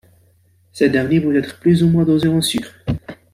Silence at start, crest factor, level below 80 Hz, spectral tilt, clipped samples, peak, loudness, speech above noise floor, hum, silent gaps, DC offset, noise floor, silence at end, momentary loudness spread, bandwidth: 0.75 s; 14 dB; -44 dBFS; -6 dB/octave; under 0.1%; -2 dBFS; -17 LUFS; 40 dB; none; none; under 0.1%; -55 dBFS; 0.2 s; 11 LU; 15.5 kHz